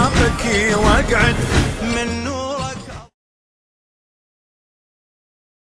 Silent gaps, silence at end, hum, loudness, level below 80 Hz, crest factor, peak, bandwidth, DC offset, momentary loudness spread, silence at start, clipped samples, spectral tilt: none; 2.65 s; none; -17 LUFS; -28 dBFS; 18 dB; -2 dBFS; 13.5 kHz; under 0.1%; 13 LU; 0 s; under 0.1%; -4.5 dB/octave